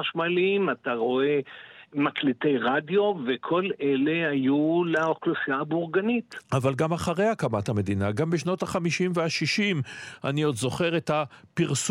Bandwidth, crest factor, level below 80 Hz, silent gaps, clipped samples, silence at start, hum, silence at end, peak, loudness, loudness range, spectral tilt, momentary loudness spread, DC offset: 16 kHz; 14 dB; -64 dBFS; none; under 0.1%; 0 s; none; 0 s; -12 dBFS; -26 LUFS; 2 LU; -5.5 dB/octave; 5 LU; under 0.1%